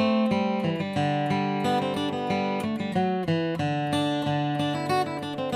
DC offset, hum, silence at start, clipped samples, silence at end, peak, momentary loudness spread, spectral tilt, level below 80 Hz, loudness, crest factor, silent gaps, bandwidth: under 0.1%; none; 0 s; under 0.1%; 0 s; -12 dBFS; 3 LU; -6.5 dB/octave; -64 dBFS; -26 LUFS; 14 dB; none; 15 kHz